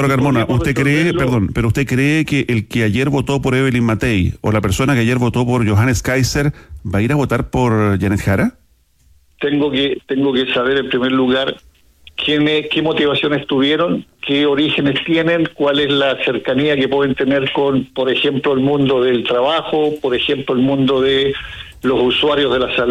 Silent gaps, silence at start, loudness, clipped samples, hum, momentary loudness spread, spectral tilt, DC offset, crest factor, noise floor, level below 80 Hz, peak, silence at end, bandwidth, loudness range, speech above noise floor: none; 0 s; -15 LUFS; under 0.1%; none; 4 LU; -6 dB/octave; under 0.1%; 10 dB; -54 dBFS; -38 dBFS; -4 dBFS; 0 s; 15 kHz; 2 LU; 39 dB